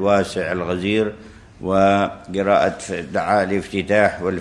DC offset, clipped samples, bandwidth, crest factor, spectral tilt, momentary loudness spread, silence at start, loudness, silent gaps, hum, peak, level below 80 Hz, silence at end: under 0.1%; under 0.1%; 12 kHz; 18 dB; -6 dB/octave; 7 LU; 0 s; -19 LUFS; none; none; -2 dBFS; -50 dBFS; 0 s